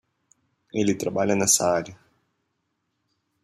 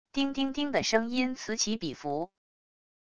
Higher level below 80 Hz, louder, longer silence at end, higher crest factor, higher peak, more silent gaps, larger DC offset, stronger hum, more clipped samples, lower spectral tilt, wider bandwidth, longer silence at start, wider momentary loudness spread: about the same, -64 dBFS vs -60 dBFS; first, -22 LUFS vs -30 LUFS; first, 1.5 s vs 0.65 s; about the same, 22 dB vs 22 dB; first, -6 dBFS vs -10 dBFS; neither; second, under 0.1% vs 0.4%; neither; neither; about the same, -3.5 dB/octave vs -3 dB/octave; first, 15 kHz vs 11 kHz; first, 0.75 s vs 0.05 s; first, 12 LU vs 8 LU